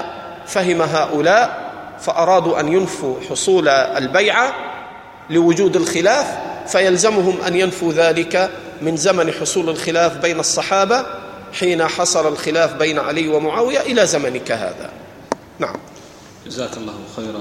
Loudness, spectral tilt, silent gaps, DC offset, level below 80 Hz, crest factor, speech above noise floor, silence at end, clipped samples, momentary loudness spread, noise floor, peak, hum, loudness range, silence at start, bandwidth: -17 LUFS; -3.5 dB/octave; none; under 0.1%; -56 dBFS; 16 dB; 24 dB; 0 s; under 0.1%; 15 LU; -40 dBFS; 0 dBFS; none; 4 LU; 0 s; 15.5 kHz